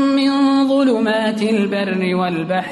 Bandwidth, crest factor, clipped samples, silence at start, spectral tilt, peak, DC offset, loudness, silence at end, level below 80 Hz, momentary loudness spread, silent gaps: 11.5 kHz; 10 dB; under 0.1%; 0 s; -6 dB/octave; -6 dBFS; under 0.1%; -17 LUFS; 0 s; -60 dBFS; 5 LU; none